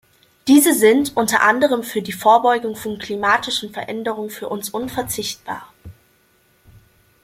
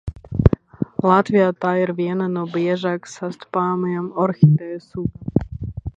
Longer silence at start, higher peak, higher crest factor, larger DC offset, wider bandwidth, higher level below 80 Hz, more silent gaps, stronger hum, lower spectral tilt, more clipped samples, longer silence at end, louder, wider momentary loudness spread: first, 0.45 s vs 0.05 s; about the same, -2 dBFS vs 0 dBFS; about the same, 18 dB vs 20 dB; neither; first, 16.5 kHz vs 8 kHz; second, -56 dBFS vs -36 dBFS; neither; neither; second, -3 dB/octave vs -8.5 dB/octave; neither; first, 1.35 s vs 0.05 s; about the same, -18 LUFS vs -20 LUFS; about the same, 14 LU vs 12 LU